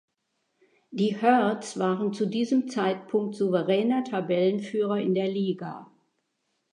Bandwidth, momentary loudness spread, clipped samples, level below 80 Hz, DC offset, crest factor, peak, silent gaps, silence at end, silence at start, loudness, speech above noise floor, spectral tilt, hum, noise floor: 10.5 kHz; 6 LU; under 0.1%; -80 dBFS; under 0.1%; 20 dB; -8 dBFS; none; 0.9 s; 0.9 s; -26 LUFS; 52 dB; -6.5 dB/octave; none; -77 dBFS